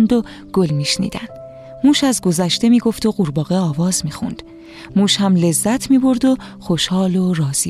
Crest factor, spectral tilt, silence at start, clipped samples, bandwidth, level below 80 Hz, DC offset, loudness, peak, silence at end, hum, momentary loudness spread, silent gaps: 14 dB; -5 dB/octave; 0 s; under 0.1%; 14.5 kHz; -46 dBFS; under 0.1%; -16 LUFS; -4 dBFS; 0 s; none; 13 LU; none